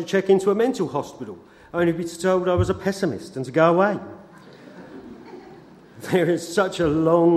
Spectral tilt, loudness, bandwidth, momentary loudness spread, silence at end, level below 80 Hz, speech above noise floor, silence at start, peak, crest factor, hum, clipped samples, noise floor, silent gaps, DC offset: -6.5 dB/octave; -21 LUFS; 14 kHz; 23 LU; 0 s; -50 dBFS; 25 dB; 0 s; -2 dBFS; 20 dB; none; under 0.1%; -46 dBFS; none; under 0.1%